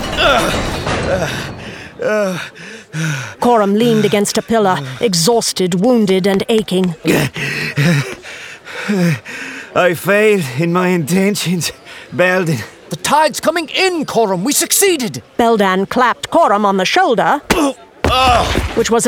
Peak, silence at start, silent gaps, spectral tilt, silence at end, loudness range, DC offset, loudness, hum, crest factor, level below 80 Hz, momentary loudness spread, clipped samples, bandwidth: 0 dBFS; 0 s; none; -4 dB/octave; 0 s; 4 LU; under 0.1%; -14 LUFS; none; 14 dB; -34 dBFS; 11 LU; under 0.1%; 19.5 kHz